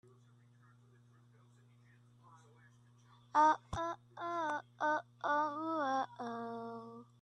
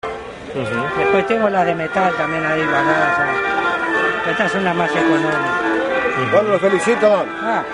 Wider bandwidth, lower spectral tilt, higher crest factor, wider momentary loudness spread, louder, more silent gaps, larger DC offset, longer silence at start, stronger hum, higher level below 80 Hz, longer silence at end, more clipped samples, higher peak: about the same, 9.8 kHz vs 10.5 kHz; about the same, -5 dB/octave vs -5.5 dB/octave; first, 22 dB vs 16 dB; first, 14 LU vs 5 LU; second, -37 LUFS vs -17 LUFS; neither; neither; first, 2.3 s vs 0.05 s; neither; second, -70 dBFS vs -50 dBFS; first, 0.2 s vs 0 s; neither; second, -18 dBFS vs -2 dBFS